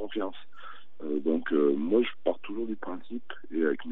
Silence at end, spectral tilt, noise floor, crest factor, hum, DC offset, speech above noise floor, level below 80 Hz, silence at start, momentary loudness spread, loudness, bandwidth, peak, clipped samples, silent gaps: 0 s; -8.5 dB/octave; -49 dBFS; 18 dB; none; 2%; 20 dB; -80 dBFS; 0 s; 19 LU; -30 LUFS; 4 kHz; -12 dBFS; under 0.1%; none